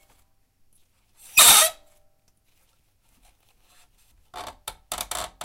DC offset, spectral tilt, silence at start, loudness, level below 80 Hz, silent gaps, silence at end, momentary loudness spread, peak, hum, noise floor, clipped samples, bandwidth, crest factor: under 0.1%; 2 dB/octave; 1.35 s; -15 LUFS; -56 dBFS; none; 0 s; 28 LU; 0 dBFS; none; -64 dBFS; under 0.1%; 17 kHz; 26 dB